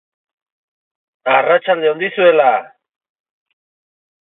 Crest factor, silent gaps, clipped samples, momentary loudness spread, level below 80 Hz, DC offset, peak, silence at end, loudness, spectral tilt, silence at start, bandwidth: 18 dB; none; under 0.1%; 8 LU; -78 dBFS; under 0.1%; 0 dBFS; 1.65 s; -14 LUFS; -9 dB/octave; 1.25 s; 4 kHz